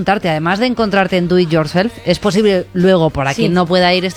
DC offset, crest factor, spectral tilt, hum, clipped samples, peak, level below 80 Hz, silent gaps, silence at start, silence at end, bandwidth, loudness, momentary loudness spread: under 0.1%; 14 dB; -6 dB/octave; none; under 0.1%; 0 dBFS; -40 dBFS; none; 0 s; 0 s; 13.5 kHz; -14 LUFS; 4 LU